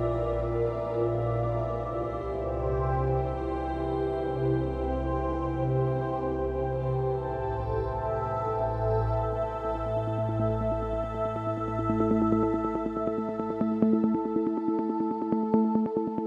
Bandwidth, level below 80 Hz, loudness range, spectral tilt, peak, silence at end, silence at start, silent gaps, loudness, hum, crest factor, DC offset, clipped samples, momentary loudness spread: 7.4 kHz; -40 dBFS; 2 LU; -10 dB/octave; -10 dBFS; 0 s; 0 s; none; -29 LUFS; none; 18 dB; under 0.1%; under 0.1%; 6 LU